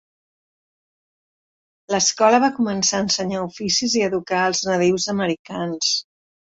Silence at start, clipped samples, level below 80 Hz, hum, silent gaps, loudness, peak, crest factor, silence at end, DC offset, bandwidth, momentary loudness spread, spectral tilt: 1.9 s; under 0.1%; -60 dBFS; none; 5.39-5.45 s; -20 LUFS; -2 dBFS; 20 dB; 0.45 s; under 0.1%; 8 kHz; 9 LU; -3 dB/octave